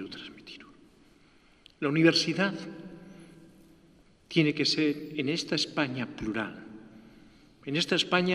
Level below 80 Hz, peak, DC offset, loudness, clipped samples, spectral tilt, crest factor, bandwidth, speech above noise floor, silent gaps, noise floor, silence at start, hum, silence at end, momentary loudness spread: -64 dBFS; -8 dBFS; under 0.1%; -28 LUFS; under 0.1%; -4.5 dB/octave; 24 dB; 12.5 kHz; 32 dB; none; -60 dBFS; 0 s; none; 0 s; 23 LU